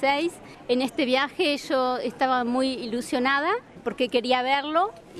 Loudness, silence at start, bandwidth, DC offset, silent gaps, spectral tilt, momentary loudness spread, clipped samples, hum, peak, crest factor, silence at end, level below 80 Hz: -25 LUFS; 0 s; 13.5 kHz; under 0.1%; none; -3.5 dB/octave; 6 LU; under 0.1%; none; -8 dBFS; 16 dB; 0 s; -62 dBFS